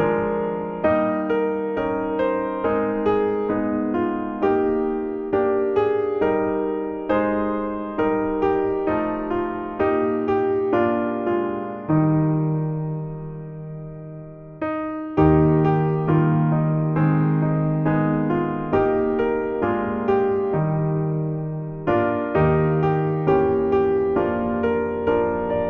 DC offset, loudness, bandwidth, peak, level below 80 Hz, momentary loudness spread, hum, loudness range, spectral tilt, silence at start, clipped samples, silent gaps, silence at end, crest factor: under 0.1%; -22 LUFS; 4.1 kHz; -4 dBFS; -46 dBFS; 8 LU; none; 3 LU; -11 dB/octave; 0 s; under 0.1%; none; 0 s; 16 dB